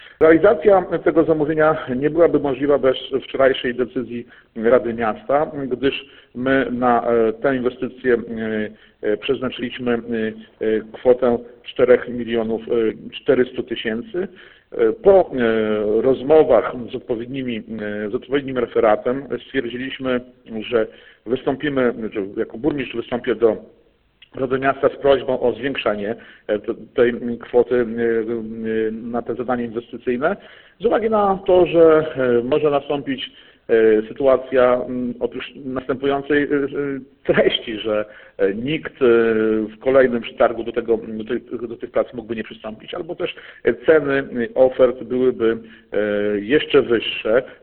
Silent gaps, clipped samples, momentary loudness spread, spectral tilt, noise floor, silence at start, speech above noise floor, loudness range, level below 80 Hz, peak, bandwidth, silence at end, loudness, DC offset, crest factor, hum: none; under 0.1%; 12 LU; -10.5 dB/octave; -54 dBFS; 0 s; 35 dB; 5 LU; -50 dBFS; 0 dBFS; 4.3 kHz; 0.1 s; -19 LUFS; under 0.1%; 20 dB; none